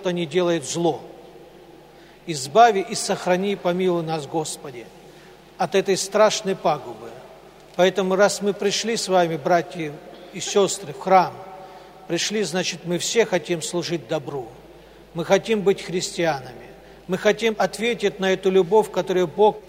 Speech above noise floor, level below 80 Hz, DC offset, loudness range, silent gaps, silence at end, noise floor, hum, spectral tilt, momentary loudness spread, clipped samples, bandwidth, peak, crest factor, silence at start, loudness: 26 dB; -60 dBFS; under 0.1%; 3 LU; none; 0.05 s; -47 dBFS; none; -4 dB/octave; 18 LU; under 0.1%; 16 kHz; -2 dBFS; 20 dB; 0 s; -21 LUFS